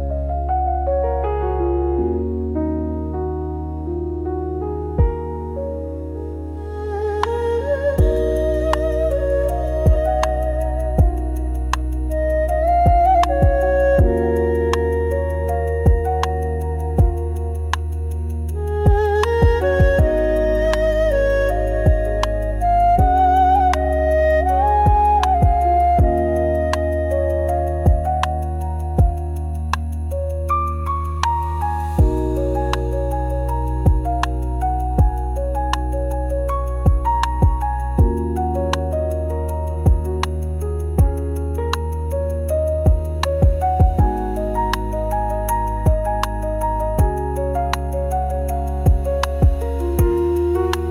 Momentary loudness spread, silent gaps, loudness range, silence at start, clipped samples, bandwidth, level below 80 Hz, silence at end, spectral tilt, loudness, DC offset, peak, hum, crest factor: 9 LU; none; 5 LU; 0 s; under 0.1%; 15.5 kHz; -22 dBFS; 0 s; -7.5 dB/octave; -19 LUFS; under 0.1%; -4 dBFS; none; 14 dB